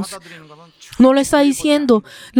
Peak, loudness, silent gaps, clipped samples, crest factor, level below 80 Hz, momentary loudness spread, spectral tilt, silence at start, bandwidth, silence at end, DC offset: 0 dBFS; -14 LUFS; none; under 0.1%; 16 dB; -50 dBFS; 19 LU; -4 dB/octave; 0 s; 17 kHz; 0 s; under 0.1%